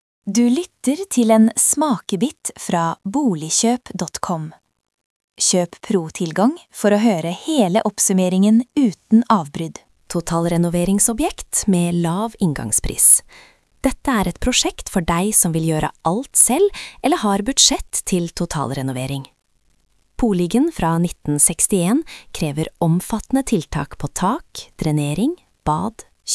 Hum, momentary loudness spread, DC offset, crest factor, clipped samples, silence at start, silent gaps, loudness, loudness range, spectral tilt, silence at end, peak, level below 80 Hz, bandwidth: none; 12 LU; under 0.1%; 18 dB; under 0.1%; 0.25 s; 5.05-5.28 s; -18 LUFS; 6 LU; -4 dB/octave; 0 s; 0 dBFS; -40 dBFS; 12 kHz